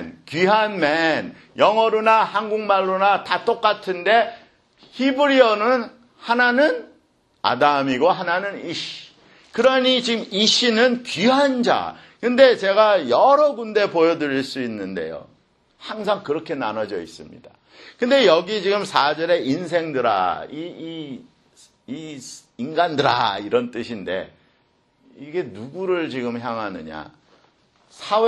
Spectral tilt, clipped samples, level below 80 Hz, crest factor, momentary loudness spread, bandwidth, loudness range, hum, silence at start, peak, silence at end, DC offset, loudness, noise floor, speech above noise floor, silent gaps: -4 dB/octave; under 0.1%; -66 dBFS; 20 dB; 17 LU; 11 kHz; 10 LU; none; 0 s; 0 dBFS; 0 s; under 0.1%; -19 LUFS; -63 dBFS; 43 dB; none